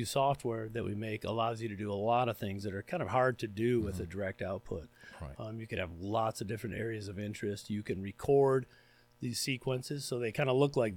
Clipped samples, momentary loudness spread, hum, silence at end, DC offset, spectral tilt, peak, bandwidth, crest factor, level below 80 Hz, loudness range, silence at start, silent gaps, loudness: under 0.1%; 11 LU; none; 0 s; under 0.1%; -5.5 dB/octave; -16 dBFS; 17.5 kHz; 18 dB; -62 dBFS; 5 LU; 0 s; none; -35 LUFS